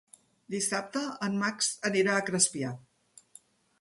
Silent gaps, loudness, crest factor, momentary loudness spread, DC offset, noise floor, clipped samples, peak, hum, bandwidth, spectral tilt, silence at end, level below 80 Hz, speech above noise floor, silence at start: none; -29 LUFS; 22 dB; 11 LU; under 0.1%; -61 dBFS; under 0.1%; -10 dBFS; none; 11.5 kHz; -3 dB/octave; 1 s; -74 dBFS; 31 dB; 0.5 s